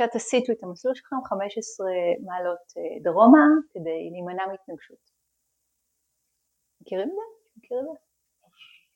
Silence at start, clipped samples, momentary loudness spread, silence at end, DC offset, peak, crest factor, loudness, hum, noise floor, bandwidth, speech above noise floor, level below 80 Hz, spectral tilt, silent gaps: 0 s; under 0.1%; 19 LU; 1 s; under 0.1%; -4 dBFS; 22 dB; -24 LUFS; none; -76 dBFS; 9.4 kHz; 53 dB; -76 dBFS; -5 dB/octave; none